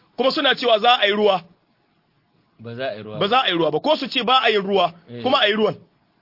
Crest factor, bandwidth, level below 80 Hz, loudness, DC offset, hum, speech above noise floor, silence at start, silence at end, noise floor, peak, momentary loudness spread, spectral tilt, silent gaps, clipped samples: 18 dB; 5.8 kHz; -68 dBFS; -19 LUFS; under 0.1%; none; 45 dB; 0.2 s; 0.45 s; -64 dBFS; -2 dBFS; 13 LU; -5 dB/octave; none; under 0.1%